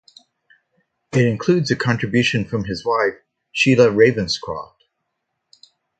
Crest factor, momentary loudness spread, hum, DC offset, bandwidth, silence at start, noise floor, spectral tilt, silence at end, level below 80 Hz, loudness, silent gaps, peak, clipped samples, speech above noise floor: 20 dB; 11 LU; none; under 0.1%; 9.2 kHz; 1.15 s; -76 dBFS; -5.5 dB/octave; 1.35 s; -52 dBFS; -18 LUFS; none; 0 dBFS; under 0.1%; 58 dB